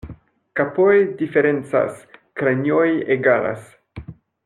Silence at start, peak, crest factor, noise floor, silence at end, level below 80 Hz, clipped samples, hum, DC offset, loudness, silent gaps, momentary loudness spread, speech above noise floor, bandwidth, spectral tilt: 0.05 s; -4 dBFS; 16 dB; -42 dBFS; 0.35 s; -52 dBFS; under 0.1%; none; under 0.1%; -19 LUFS; none; 19 LU; 24 dB; 11 kHz; -8 dB/octave